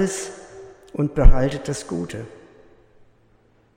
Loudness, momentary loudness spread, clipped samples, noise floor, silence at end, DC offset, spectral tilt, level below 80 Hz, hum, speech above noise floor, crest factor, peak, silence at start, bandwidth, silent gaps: -24 LUFS; 22 LU; under 0.1%; -58 dBFS; 1.5 s; under 0.1%; -6 dB/octave; -22 dBFS; none; 41 dB; 20 dB; 0 dBFS; 0 s; 10.5 kHz; none